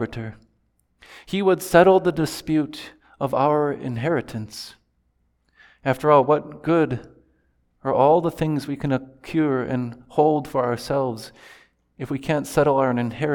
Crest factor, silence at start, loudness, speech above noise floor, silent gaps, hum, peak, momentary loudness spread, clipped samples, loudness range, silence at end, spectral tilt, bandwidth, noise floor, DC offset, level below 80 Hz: 20 dB; 0 s; -21 LUFS; 46 dB; none; none; -2 dBFS; 16 LU; under 0.1%; 4 LU; 0 s; -6.5 dB/octave; 19.5 kHz; -67 dBFS; under 0.1%; -52 dBFS